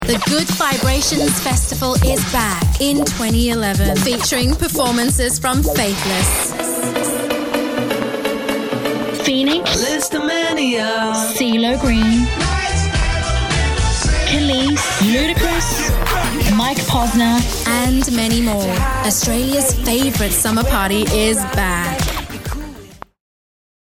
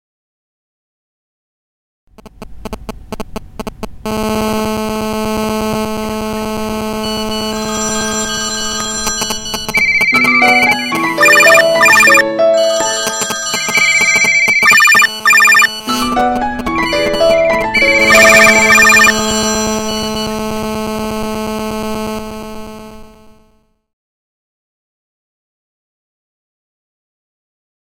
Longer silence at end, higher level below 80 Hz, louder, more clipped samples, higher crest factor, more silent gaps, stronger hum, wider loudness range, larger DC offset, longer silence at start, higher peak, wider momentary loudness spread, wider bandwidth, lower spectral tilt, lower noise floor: second, 0.85 s vs 4.65 s; first, -24 dBFS vs -36 dBFS; second, -16 LUFS vs -10 LUFS; second, under 0.1% vs 0.1%; about the same, 16 dB vs 14 dB; neither; neither; second, 2 LU vs 15 LU; neither; second, 0 s vs 2.25 s; about the same, 0 dBFS vs 0 dBFS; second, 5 LU vs 17 LU; about the same, 18 kHz vs 17 kHz; first, -4 dB/octave vs -2 dB/octave; second, -37 dBFS vs -54 dBFS